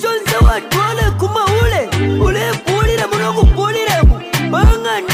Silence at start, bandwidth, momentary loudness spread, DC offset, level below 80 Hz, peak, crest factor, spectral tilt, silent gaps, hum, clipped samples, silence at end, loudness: 0 s; 16 kHz; 4 LU; under 0.1%; -16 dBFS; -2 dBFS; 12 dB; -5 dB/octave; none; none; under 0.1%; 0 s; -14 LUFS